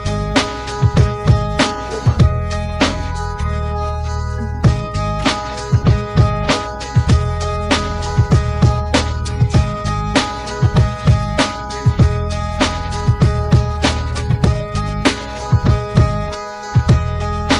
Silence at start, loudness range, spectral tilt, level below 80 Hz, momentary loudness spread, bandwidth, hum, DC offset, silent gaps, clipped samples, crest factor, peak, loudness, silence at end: 0 s; 2 LU; -6 dB/octave; -22 dBFS; 7 LU; 11 kHz; none; under 0.1%; none; under 0.1%; 16 dB; 0 dBFS; -17 LUFS; 0 s